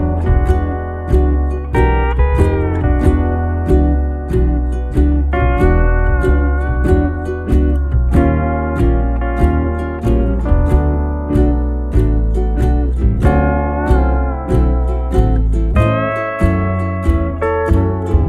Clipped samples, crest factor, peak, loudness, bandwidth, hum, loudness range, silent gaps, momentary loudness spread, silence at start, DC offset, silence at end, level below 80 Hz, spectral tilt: under 0.1%; 12 dB; 0 dBFS; -15 LUFS; 3.9 kHz; none; 1 LU; none; 4 LU; 0 s; under 0.1%; 0 s; -16 dBFS; -9.5 dB/octave